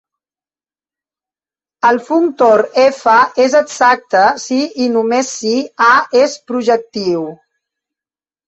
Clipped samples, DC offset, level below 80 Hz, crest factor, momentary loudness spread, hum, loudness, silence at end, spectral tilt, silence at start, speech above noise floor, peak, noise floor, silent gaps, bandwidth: under 0.1%; under 0.1%; -60 dBFS; 14 dB; 7 LU; none; -13 LUFS; 1.15 s; -3.5 dB/octave; 1.85 s; over 78 dB; 0 dBFS; under -90 dBFS; none; 8.2 kHz